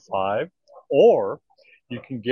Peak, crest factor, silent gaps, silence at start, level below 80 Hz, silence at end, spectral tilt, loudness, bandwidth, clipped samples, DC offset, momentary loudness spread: -4 dBFS; 18 dB; none; 0.1 s; -72 dBFS; 0 s; -7 dB/octave; -21 LUFS; 6.6 kHz; under 0.1%; under 0.1%; 21 LU